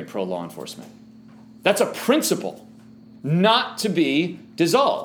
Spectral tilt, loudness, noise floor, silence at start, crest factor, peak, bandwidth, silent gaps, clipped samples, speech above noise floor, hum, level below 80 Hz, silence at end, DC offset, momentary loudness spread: -4.5 dB/octave; -21 LUFS; -46 dBFS; 0 s; 20 dB; -2 dBFS; over 20 kHz; none; under 0.1%; 25 dB; none; -72 dBFS; 0 s; under 0.1%; 16 LU